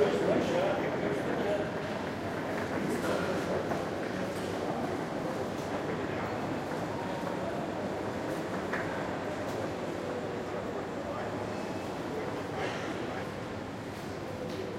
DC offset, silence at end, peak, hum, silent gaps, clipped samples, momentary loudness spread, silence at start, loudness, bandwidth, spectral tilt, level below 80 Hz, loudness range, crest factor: under 0.1%; 0 s; -14 dBFS; none; none; under 0.1%; 5 LU; 0 s; -34 LUFS; 16.5 kHz; -6 dB/octave; -60 dBFS; 4 LU; 20 dB